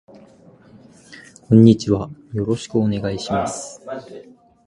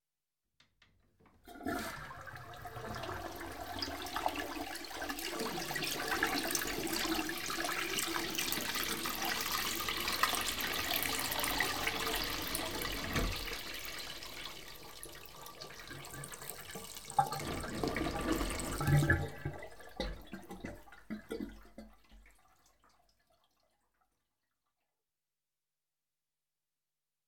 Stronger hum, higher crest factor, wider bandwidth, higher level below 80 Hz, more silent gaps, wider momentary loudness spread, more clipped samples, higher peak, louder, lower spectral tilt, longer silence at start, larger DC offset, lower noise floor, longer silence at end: neither; second, 20 dB vs 26 dB; second, 11 kHz vs 19 kHz; about the same, -48 dBFS vs -52 dBFS; neither; first, 21 LU vs 15 LU; neither; first, 0 dBFS vs -12 dBFS; first, -18 LUFS vs -36 LUFS; first, -7 dB/octave vs -3 dB/octave; first, 1.1 s vs 0 s; second, under 0.1% vs 0.2%; second, -48 dBFS vs under -90 dBFS; first, 0.45 s vs 0 s